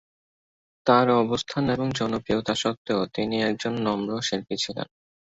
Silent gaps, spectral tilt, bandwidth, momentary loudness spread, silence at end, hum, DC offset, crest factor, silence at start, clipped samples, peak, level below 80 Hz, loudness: 2.77-2.85 s; -5 dB/octave; 8.2 kHz; 8 LU; 0.45 s; none; under 0.1%; 22 dB; 0.85 s; under 0.1%; -4 dBFS; -56 dBFS; -25 LUFS